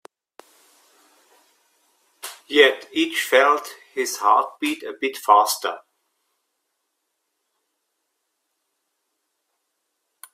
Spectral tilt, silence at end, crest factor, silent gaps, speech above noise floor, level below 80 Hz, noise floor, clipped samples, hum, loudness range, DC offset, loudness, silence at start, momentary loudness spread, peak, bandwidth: -0.5 dB/octave; 4.55 s; 24 dB; none; 57 dB; -78 dBFS; -76 dBFS; under 0.1%; none; 5 LU; under 0.1%; -19 LUFS; 2.25 s; 17 LU; 0 dBFS; 16 kHz